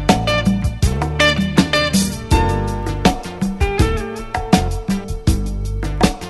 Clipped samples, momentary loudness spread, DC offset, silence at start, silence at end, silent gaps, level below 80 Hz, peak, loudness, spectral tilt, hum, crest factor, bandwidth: under 0.1%; 9 LU; under 0.1%; 0 s; 0 s; none; -24 dBFS; 0 dBFS; -18 LUFS; -5 dB/octave; none; 16 dB; 12.5 kHz